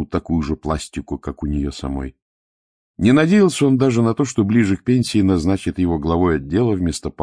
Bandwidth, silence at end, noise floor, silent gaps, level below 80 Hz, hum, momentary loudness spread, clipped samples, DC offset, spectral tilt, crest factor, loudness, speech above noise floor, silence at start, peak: 10.5 kHz; 0 s; under -90 dBFS; 2.22-2.94 s; -36 dBFS; none; 12 LU; under 0.1%; under 0.1%; -6.5 dB/octave; 16 dB; -18 LUFS; over 72 dB; 0 s; -2 dBFS